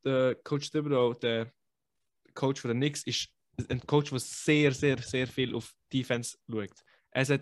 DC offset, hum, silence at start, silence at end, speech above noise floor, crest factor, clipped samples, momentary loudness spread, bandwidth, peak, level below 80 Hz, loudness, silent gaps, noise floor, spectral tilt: under 0.1%; none; 0.05 s; 0 s; 56 dB; 20 dB; under 0.1%; 11 LU; 12.5 kHz; -10 dBFS; -64 dBFS; -31 LUFS; none; -86 dBFS; -5 dB/octave